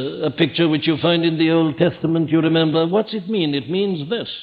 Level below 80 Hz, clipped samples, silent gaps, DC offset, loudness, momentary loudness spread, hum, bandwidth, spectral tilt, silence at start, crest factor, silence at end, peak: -60 dBFS; under 0.1%; none; under 0.1%; -18 LUFS; 5 LU; none; 5 kHz; -9.5 dB/octave; 0 s; 16 dB; 0 s; -2 dBFS